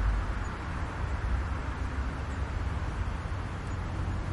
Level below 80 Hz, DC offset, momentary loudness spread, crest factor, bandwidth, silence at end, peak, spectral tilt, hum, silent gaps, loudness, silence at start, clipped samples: -34 dBFS; under 0.1%; 3 LU; 14 dB; 11 kHz; 0 s; -18 dBFS; -6.5 dB/octave; none; none; -35 LUFS; 0 s; under 0.1%